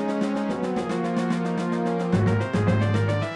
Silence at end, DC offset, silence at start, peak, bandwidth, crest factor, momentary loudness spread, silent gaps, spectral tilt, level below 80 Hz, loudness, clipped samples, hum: 0 s; under 0.1%; 0 s; -10 dBFS; 10.5 kHz; 14 dB; 4 LU; none; -7.5 dB/octave; -50 dBFS; -24 LUFS; under 0.1%; none